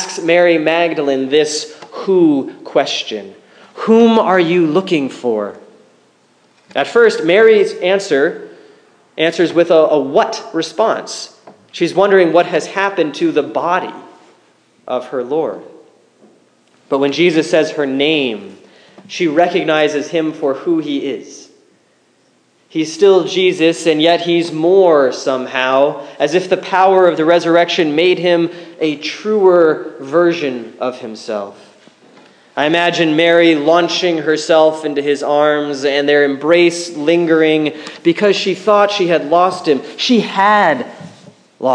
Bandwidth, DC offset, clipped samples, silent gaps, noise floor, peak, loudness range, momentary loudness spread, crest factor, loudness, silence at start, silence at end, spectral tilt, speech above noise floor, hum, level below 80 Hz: 10 kHz; under 0.1%; under 0.1%; none; -55 dBFS; 0 dBFS; 5 LU; 12 LU; 14 dB; -13 LUFS; 0 s; 0 s; -4.5 dB/octave; 42 dB; none; -68 dBFS